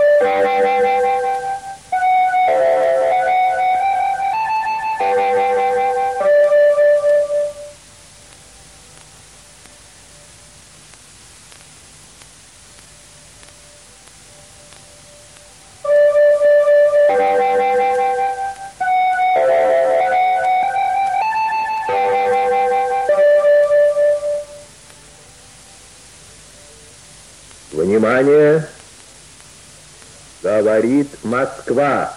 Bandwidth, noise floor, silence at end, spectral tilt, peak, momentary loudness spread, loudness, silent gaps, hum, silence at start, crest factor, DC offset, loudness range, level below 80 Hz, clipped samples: 12 kHz; -43 dBFS; 0 s; -5 dB/octave; -4 dBFS; 9 LU; -15 LUFS; none; none; 0 s; 12 dB; 0.1%; 6 LU; -54 dBFS; under 0.1%